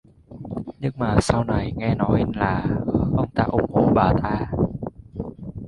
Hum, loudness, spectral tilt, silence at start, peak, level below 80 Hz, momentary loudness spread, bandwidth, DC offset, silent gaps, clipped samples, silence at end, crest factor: none; -22 LUFS; -7.5 dB/octave; 0.3 s; -2 dBFS; -36 dBFS; 15 LU; 11.5 kHz; under 0.1%; none; under 0.1%; 0 s; 20 dB